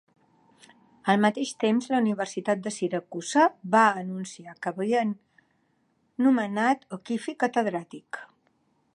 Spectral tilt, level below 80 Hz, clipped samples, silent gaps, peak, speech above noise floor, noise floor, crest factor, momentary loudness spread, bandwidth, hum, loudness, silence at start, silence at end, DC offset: -5 dB/octave; -78 dBFS; under 0.1%; none; -6 dBFS; 44 dB; -70 dBFS; 20 dB; 15 LU; 11 kHz; none; -26 LUFS; 1.05 s; 0.7 s; under 0.1%